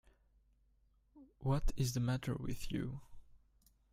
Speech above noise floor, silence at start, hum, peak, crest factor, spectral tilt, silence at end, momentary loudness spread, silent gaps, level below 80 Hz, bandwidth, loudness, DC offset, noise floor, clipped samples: 36 dB; 1.15 s; none; -24 dBFS; 16 dB; -6 dB/octave; 0.55 s; 8 LU; none; -48 dBFS; 16 kHz; -39 LUFS; under 0.1%; -73 dBFS; under 0.1%